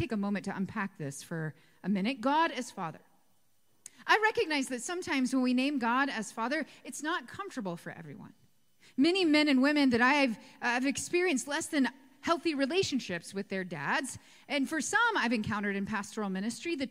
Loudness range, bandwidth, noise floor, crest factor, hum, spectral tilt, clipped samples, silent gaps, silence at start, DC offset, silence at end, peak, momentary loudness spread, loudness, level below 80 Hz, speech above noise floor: 6 LU; 15.5 kHz; -74 dBFS; 20 dB; none; -4 dB/octave; under 0.1%; none; 0 s; under 0.1%; 0 s; -12 dBFS; 15 LU; -31 LUFS; -70 dBFS; 43 dB